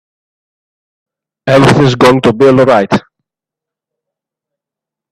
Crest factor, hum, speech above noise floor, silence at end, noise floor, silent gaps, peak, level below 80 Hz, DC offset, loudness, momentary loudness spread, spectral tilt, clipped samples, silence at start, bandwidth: 12 dB; none; 77 dB; 2.1 s; -84 dBFS; none; 0 dBFS; -44 dBFS; under 0.1%; -8 LUFS; 9 LU; -6.5 dB/octave; under 0.1%; 1.45 s; 14 kHz